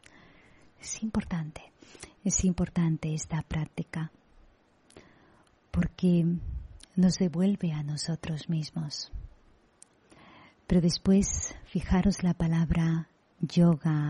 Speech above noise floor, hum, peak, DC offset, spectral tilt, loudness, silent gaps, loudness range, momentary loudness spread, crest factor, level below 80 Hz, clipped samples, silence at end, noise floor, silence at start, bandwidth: 34 dB; none; -14 dBFS; under 0.1%; -6 dB/octave; -29 LUFS; none; 6 LU; 16 LU; 16 dB; -44 dBFS; under 0.1%; 0 s; -62 dBFS; 0.85 s; 11 kHz